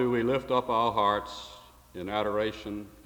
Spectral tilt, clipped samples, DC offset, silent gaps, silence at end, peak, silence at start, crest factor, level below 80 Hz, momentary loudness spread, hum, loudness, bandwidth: -6 dB/octave; under 0.1%; under 0.1%; none; 0.05 s; -12 dBFS; 0 s; 18 dB; -56 dBFS; 16 LU; none; -28 LUFS; over 20 kHz